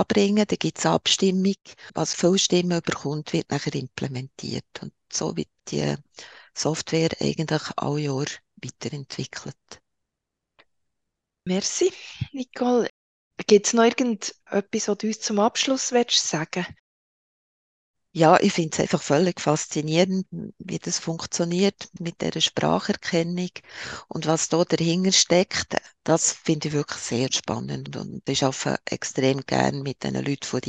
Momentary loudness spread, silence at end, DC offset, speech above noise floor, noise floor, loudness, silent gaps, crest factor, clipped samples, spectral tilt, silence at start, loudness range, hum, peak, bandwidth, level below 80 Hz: 14 LU; 0 s; under 0.1%; 60 dB; -84 dBFS; -24 LUFS; 12.90-13.31 s, 16.79-17.94 s; 22 dB; under 0.1%; -4 dB/octave; 0 s; 8 LU; none; -2 dBFS; 9.6 kHz; -60 dBFS